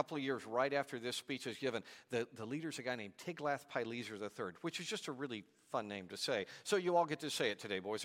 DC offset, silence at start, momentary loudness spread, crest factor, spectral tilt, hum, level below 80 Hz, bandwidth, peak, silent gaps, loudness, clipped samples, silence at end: under 0.1%; 0 s; 9 LU; 22 dB; -4 dB/octave; none; -86 dBFS; 16.5 kHz; -20 dBFS; none; -41 LUFS; under 0.1%; 0 s